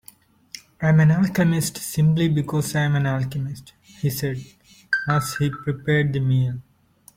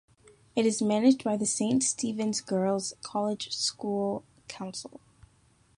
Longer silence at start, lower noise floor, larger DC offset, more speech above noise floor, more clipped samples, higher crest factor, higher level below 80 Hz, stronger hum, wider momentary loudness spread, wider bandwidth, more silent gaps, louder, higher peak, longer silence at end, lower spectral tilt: about the same, 0.55 s vs 0.55 s; second, -55 dBFS vs -64 dBFS; neither; about the same, 34 dB vs 35 dB; neither; about the same, 16 dB vs 18 dB; first, -52 dBFS vs -68 dBFS; neither; about the same, 14 LU vs 14 LU; first, 16.5 kHz vs 11.5 kHz; neither; first, -22 LUFS vs -28 LUFS; first, -6 dBFS vs -12 dBFS; second, 0.55 s vs 0.9 s; first, -6 dB/octave vs -4 dB/octave